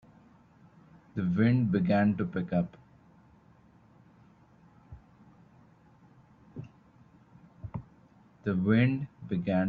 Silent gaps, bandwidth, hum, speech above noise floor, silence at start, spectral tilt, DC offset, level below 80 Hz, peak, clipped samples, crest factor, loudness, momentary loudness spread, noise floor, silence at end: none; 4.7 kHz; none; 33 dB; 1.15 s; -10.5 dB/octave; under 0.1%; -62 dBFS; -12 dBFS; under 0.1%; 20 dB; -29 LUFS; 22 LU; -60 dBFS; 0 s